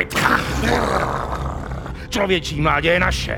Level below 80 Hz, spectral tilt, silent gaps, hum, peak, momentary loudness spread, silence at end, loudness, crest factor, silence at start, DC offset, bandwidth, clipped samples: -30 dBFS; -4.5 dB/octave; none; none; 0 dBFS; 11 LU; 0 s; -19 LUFS; 20 dB; 0 s; under 0.1%; over 20 kHz; under 0.1%